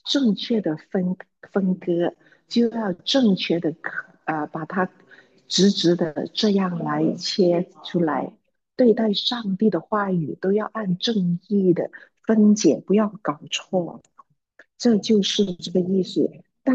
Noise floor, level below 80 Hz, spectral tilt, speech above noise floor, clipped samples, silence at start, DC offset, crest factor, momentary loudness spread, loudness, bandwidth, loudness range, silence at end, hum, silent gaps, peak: -56 dBFS; -70 dBFS; -5.5 dB/octave; 35 dB; under 0.1%; 0.05 s; under 0.1%; 16 dB; 10 LU; -22 LUFS; 8.2 kHz; 2 LU; 0 s; none; none; -6 dBFS